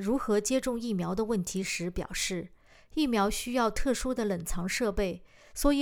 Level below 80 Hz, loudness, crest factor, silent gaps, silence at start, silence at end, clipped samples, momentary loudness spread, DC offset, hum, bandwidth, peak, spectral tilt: -42 dBFS; -30 LUFS; 16 dB; none; 0 s; 0 s; under 0.1%; 7 LU; under 0.1%; none; over 20 kHz; -14 dBFS; -4.5 dB/octave